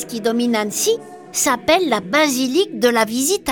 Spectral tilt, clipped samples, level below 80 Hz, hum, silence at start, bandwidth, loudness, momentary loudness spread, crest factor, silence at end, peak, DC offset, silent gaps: -2.5 dB/octave; under 0.1%; -56 dBFS; none; 0 s; 19 kHz; -17 LUFS; 4 LU; 16 dB; 0 s; -2 dBFS; under 0.1%; none